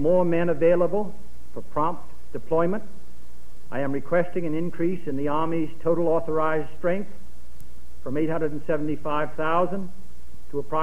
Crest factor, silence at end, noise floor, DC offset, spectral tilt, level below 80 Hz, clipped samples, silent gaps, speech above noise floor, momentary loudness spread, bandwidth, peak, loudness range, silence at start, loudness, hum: 16 dB; 0 s; -50 dBFS; 7%; -8 dB/octave; -50 dBFS; under 0.1%; none; 25 dB; 14 LU; 13.5 kHz; -8 dBFS; 3 LU; 0 s; -26 LUFS; none